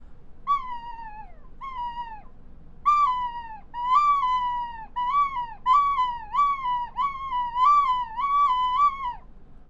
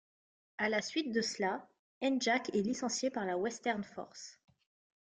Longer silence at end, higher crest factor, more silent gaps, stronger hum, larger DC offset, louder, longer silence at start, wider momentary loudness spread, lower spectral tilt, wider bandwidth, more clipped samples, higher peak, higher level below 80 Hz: second, 0.05 s vs 0.9 s; about the same, 14 dB vs 18 dB; second, none vs 1.79-2.01 s; neither; neither; first, -24 LUFS vs -35 LUFS; second, 0 s vs 0.6 s; first, 18 LU vs 15 LU; about the same, -2.5 dB/octave vs -3.5 dB/octave; second, 7.6 kHz vs 9.6 kHz; neither; first, -10 dBFS vs -20 dBFS; first, -46 dBFS vs -78 dBFS